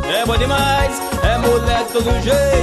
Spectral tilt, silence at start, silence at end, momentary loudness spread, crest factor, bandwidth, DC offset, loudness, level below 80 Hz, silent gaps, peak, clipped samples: -4.5 dB/octave; 0 s; 0 s; 3 LU; 12 dB; 13 kHz; under 0.1%; -16 LUFS; -24 dBFS; none; -4 dBFS; under 0.1%